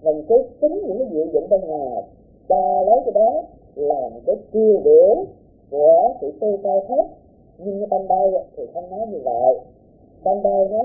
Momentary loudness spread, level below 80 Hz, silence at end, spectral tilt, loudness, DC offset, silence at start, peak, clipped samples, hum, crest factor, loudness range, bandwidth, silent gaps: 15 LU; -54 dBFS; 0 s; -16 dB/octave; -19 LUFS; under 0.1%; 0.05 s; -4 dBFS; under 0.1%; none; 16 dB; 5 LU; 0.9 kHz; none